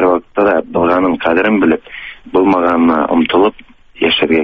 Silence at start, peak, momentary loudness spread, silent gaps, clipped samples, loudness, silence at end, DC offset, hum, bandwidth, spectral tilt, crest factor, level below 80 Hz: 0 s; 0 dBFS; 6 LU; none; under 0.1%; -13 LUFS; 0 s; under 0.1%; none; 5 kHz; -7.5 dB/octave; 12 dB; -44 dBFS